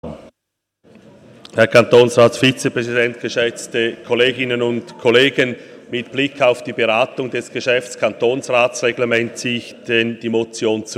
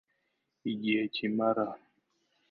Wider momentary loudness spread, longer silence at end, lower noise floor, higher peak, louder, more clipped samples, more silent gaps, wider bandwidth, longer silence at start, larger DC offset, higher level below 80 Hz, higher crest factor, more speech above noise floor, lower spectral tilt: about the same, 10 LU vs 10 LU; second, 0 s vs 0.75 s; about the same, -78 dBFS vs -80 dBFS; first, 0 dBFS vs -16 dBFS; first, -17 LUFS vs -32 LUFS; neither; neither; first, 13.5 kHz vs 5.4 kHz; second, 0.05 s vs 0.65 s; neither; first, -60 dBFS vs -80 dBFS; about the same, 18 dB vs 18 dB; first, 62 dB vs 49 dB; second, -4.5 dB/octave vs -8.5 dB/octave